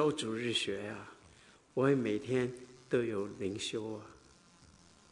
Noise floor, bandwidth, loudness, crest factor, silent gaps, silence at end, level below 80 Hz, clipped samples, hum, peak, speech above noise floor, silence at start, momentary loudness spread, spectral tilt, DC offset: -62 dBFS; 11 kHz; -35 LUFS; 20 dB; none; 0.95 s; -72 dBFS; under 0.1%; none; -16 dBFS; 27 dB; 0 s; 17 LU; -5 dB/octave; under 0.1%